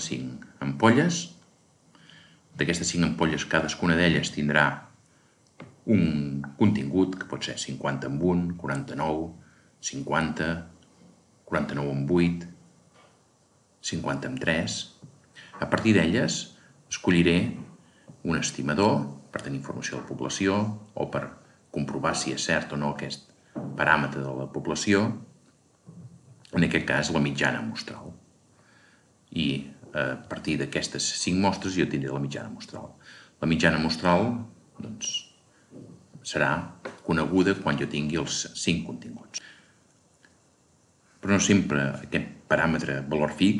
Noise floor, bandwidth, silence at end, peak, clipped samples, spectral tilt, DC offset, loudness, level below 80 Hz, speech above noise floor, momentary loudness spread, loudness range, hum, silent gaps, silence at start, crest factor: -63 dBFS; 11.5 kHz; 0 s; -4 dBFS; under 0.1%; -4.5 dB/octave; under 0.1%; -27 LUFS; -54 dBFS; 37 dB; 15 LU; 5 LU; none; none; 0 s; 24 dB